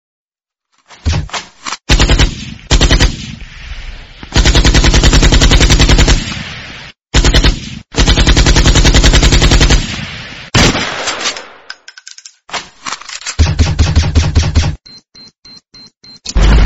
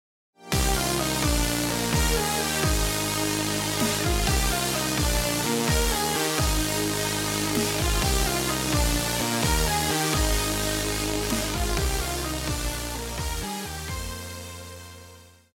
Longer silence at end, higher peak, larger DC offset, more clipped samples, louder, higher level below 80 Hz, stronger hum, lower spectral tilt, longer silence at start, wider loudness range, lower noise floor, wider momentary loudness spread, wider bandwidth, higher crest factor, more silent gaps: second, 0 s vs 0.3 s; first, 0 dBFS vs -6 dBFS; neither; first, 0.3% vs under 0.1%; first, -11 LUFS vs -25 LUFS; first, -14 dBFS vs -32 dBFS; neither; about the same, -4 dB/octave vs -3.5 dB/octave; first, 1.05 s vs 0.4 s; about the same, 7 LU vs 5 LU; first, -81 dBFS vs -49 dBFS; first, 21 LU vs 8 LU; second, 8.6 kHz vs 16.5 kHz; second, 10 dB vs 20 dB; first, 15.38-15.42 s vs none